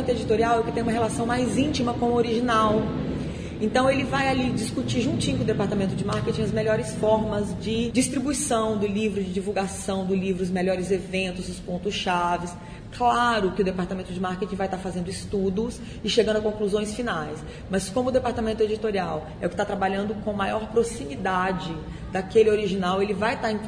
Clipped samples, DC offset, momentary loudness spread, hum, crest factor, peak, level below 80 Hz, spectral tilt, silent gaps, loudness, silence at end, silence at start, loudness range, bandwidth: under 0.1%; under 0.1%; 8 LU; none; 18 dB; -8 dBFS; -44 dBFS; -5 dB/octave; none; -25 LUFS; 0 s; 0 s; 3 LU; 11 kHz